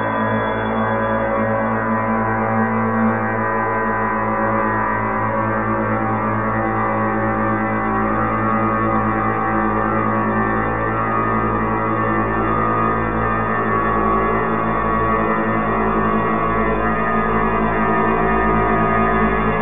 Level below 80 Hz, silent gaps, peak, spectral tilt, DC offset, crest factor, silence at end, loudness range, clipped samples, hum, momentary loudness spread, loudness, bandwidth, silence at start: -34 dBFS; none; -4 dBFS; -10.5 dB/octave; 2%; 14 dB; 0 s; 2 LU; under 0.1%; none; 3 LU; -18 LUFS; 3.7 kHz; 0 s